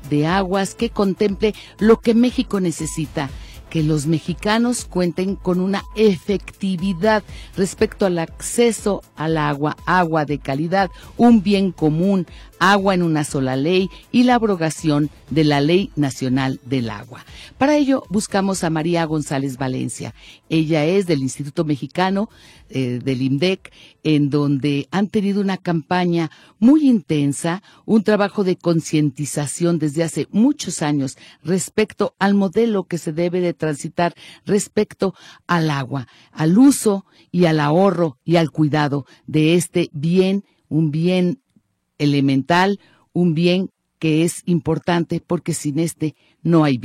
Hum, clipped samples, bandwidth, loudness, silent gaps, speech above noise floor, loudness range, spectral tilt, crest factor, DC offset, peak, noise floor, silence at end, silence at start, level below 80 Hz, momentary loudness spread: none; under 0.1%; 15 kHz; -19 LUFS; none; 43 dB; 4 LU; -6 dB/octave; 16 dB; under 0.1%; -4 dBFS; -61 dBFS; 0 s; 0 s; -46 dBFS; 9 LU